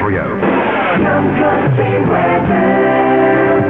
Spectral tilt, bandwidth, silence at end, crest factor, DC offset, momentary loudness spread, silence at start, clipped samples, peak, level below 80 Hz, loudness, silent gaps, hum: -10 dB/octave; 4.3 kHz; 0 s; 12 dB; 0.4%; 3 LU; 0 s; under 0.1%; 0 dBFS; -40 dBFS; -12 LUFS; none; none